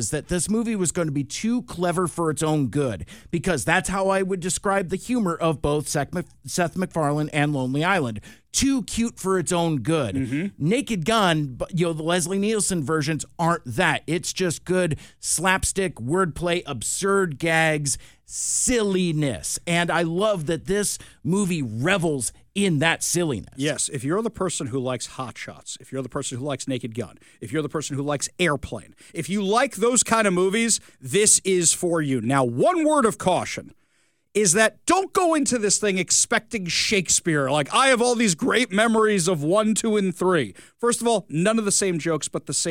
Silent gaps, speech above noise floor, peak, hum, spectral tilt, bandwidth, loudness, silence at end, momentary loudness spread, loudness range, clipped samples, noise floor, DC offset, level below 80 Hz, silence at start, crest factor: none; 44 dB; -2 dBFS; none; -3.5 dB/octave; 17.5 kHz; -22 LUFS; 0 s; 9 LU; 6 LU; under 0.1%; -67 dBFS; under 0.1%; -50 dBFS; 0 s; 20 dB